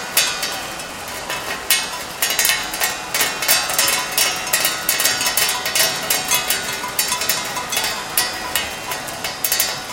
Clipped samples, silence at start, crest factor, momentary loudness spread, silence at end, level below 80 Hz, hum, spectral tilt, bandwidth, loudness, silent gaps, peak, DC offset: under 0.1%; 0 s; 20 dB; 9 LU; 0 s; -50 dBFS; none; 0.5 dB/octave; 18 kHz; -18 LUFS; none; 0 dBFS; under 0.1%